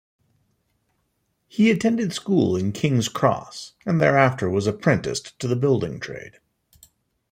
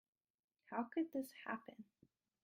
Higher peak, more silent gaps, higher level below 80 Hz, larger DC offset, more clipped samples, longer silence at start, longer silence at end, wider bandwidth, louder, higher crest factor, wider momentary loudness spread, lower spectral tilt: first, -4 dBFS vs -28 dBFS; neither; first, -58 dBFS vs under -90 dBFS; neither; neither; first, 1.55 s vs 0.7 s; first, 1.05 s vs 0.6 s; about the same, 16 kHz vs 16 kHz; first, -22 LUFS vs -46 LUFS; about the same, 20 dB vs 20 dB; second, 14 LU vs 19 LU; about the same, -6 dB/octave vs -5.5 dB/octave